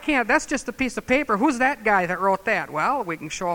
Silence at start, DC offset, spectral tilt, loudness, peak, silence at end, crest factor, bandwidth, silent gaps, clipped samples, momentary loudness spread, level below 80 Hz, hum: 0 s; under 0.1%; -4 dB/octave; -22 LUFS; -4 dBFS; 0 s; 18 dB; 18.5 kHz; none; under 0.1%; 7 LU; -48 dBFS; none